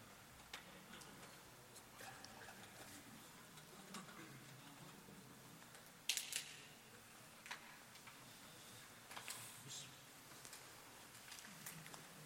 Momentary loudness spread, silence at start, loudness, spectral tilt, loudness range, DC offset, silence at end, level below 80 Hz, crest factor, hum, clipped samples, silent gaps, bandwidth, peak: 12 LU; 0 s; -54 LUFS; -1.5 dB/octave; 7 LU; under 0.1%; 0 s; -82 dBFS; 36 dB; none; under 0.1%; none; 16.5 kHz; -20 dBFS